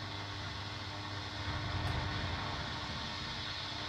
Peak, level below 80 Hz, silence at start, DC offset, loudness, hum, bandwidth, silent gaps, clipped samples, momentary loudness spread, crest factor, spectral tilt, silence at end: -24 dBFS; -52 dBFS; 0 s; under 0.1%; -39 LUFS; none; 13.5 kHz; none; under 0.1%; 5 LU; 16 dB; -4.5 dB/octave; 0 s